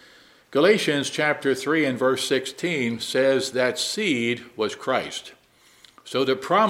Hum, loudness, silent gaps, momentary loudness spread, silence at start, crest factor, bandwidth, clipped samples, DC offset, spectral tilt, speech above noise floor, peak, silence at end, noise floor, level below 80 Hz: none; -23 LUFS; none; 7 LU; 0.5 s; 18 dB; 16 kHz; under 0.1%; under 0.1%; -3.5 dB/octave; 32 dB; -6 dBFS; 0 s; -55 dBFS; -70 dBFS